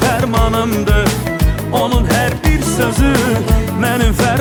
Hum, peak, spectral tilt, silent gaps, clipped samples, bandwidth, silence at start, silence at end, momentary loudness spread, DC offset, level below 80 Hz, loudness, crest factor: none; 0 dBFS; -5.5 dB/octave; none; under 0.1%; over 20 kHz; 0 s; 0 s; 3 LU; under 0.1%; -18 dBFS; -14 LUFS; 12 dB